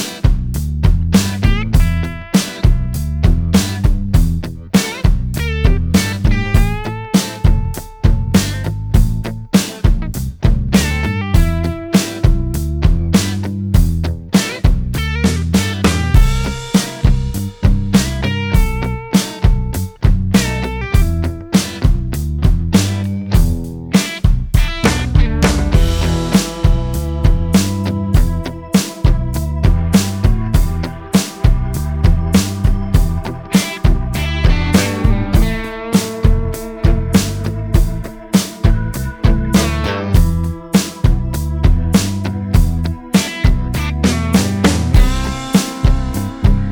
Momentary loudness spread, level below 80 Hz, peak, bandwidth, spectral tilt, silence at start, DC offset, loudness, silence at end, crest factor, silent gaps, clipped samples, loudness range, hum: 6 LU; -18 dBFS; 0 dBFS; 20 kHz; -5.5 dB/octave; 0 s; under 0.1%; -16 LUFS; 0 s; 14 dB; none; under 0.1%; 1 LU; none